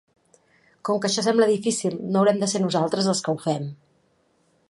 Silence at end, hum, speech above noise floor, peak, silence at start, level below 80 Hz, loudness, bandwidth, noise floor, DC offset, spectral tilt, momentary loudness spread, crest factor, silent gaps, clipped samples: 0.95 s; none; 43 dB; -6 dBFS; 0.85 s; -70 dBFS; -23 LUFS; 11.5 kHz; -65 dBFS; under 0.1%; -4.5 dB/octave; 8 LU; 18 dB; none; under 0.1%